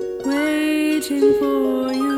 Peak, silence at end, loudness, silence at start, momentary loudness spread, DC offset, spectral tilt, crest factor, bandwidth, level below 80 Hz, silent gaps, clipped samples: -6 dBFS; 0 s; -19 LUFS; 0 s; 4 LU; under 0.1%; -4 dB/octave; 14 dB; 16 kHz; -54 dBFS; none; under 0.1%